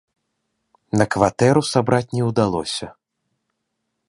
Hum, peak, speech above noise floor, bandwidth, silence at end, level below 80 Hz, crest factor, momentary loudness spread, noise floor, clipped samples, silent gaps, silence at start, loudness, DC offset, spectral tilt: none; -2 dBFS; 58 dB; 11.5 kHz; 1.15 s; -50 dBFS; 20 dB; 10 LU; -76 dBFS; under 0.1%; none; 0.95 s; -19 LUFS; under 0.1%; -5.5 dB/octave